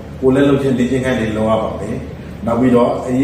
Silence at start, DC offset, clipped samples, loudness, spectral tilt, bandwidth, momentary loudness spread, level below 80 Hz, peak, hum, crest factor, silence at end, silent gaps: 0 s; under 0.1%; under 0.1%; -15 LUFS; -7.5 dB/octave; 12.5 kHz; 12 LU; -36 dBFS; -2 dBFS; none; 14 dB; 0 s; none